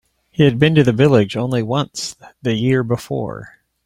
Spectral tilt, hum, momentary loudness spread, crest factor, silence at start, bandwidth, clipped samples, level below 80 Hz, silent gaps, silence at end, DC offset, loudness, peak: -6.5 dB/octave; none; 15 LU; 16 dB; 0.4 s; 14 kHz; under 0.1%; -50 dBFS; none; 0.4 s; under 0.1%; -17 LUFS; 0 dBFS